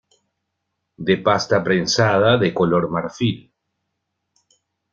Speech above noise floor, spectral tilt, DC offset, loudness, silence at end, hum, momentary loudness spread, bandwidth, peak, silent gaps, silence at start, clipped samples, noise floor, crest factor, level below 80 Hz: 59 dB; -5 dB/octave; under 0.1%; -18 LUFS; 1.55 s; none; 8 LU; 7.6 kHz; -2 dBFS; none; 1 s; under 0.1%; -77 dBFS; 18 dB; -54 dBFS